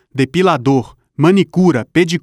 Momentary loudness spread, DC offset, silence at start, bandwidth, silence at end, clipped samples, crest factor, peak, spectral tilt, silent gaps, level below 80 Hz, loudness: 5 LU; under 0.1%; 0.15 s; 12.5 kHz; 0.05 s; under 0.1%; 12 dB; 0 dBFS; -6.5 dB/octave; none; -50 dBFS; -14 LUFS